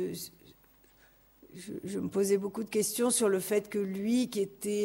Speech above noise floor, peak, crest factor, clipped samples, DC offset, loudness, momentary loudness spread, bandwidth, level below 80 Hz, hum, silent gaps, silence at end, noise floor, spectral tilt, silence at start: 32 dB; -16 dBFS; 16 dB; under 0.1%; under 0.1%; -31 LUFS; 14 LU; 16 kHz; -70 dBFS; none; none; 0 s; -62 dBFS; -4 dB/octave; 0 s